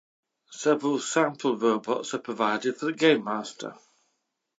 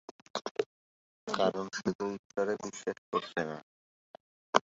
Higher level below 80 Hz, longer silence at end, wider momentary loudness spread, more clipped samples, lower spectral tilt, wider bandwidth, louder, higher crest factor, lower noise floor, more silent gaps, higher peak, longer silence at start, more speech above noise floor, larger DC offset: second, -84 dBFS vs -74 dBFS; first, 0.85 s vs 0.05 s; first, 13 LU vs 10 LU; neither; about the same, -4 dB/octave vs -3 dB/octave; first, 9.2 kHz vs 8 kHz; first, -26 LUFS vs -35 LUFS; second, 20 dB vs 32 dB; second, -78 dBFS vs under -90 dBFS; second, none vs 0.11-0.34 s, 0.51-0.55 s, 0.66-1.27 s, 1.95-1.99 s, 2.19-2.30 s, 2.98-3.12 s, 3.63-4.14 s, 4.20-4.53 s; about the same, -6 dBFS vs -4 dBFS; first, 0.5 s vs 0.1 s; second, 52 dB vs over 56 dB; neither